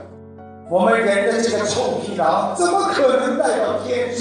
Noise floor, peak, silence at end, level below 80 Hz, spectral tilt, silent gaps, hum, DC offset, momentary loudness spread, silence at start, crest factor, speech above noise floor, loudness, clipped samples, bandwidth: -39 dBFS; -4 dBFS; 0 s; -62 dBFS; -4 dB/octave; none; none; under 0.1%; 5 LU; 0 s; 14 dB; 21 dB; -18 LUFS; under 0.1%; 10 kHz